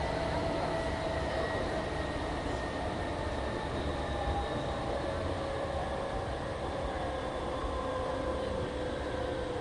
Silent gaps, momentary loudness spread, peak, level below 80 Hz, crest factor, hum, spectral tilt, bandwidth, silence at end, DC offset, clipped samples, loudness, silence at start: none; 3 LU; -22 dBFS; -42 dBFS; 12 dB; none; -6 dB/octave; 11.5 kHz; 0 s; under 0.1%; under 0.1%; -35 LUFS; 0 s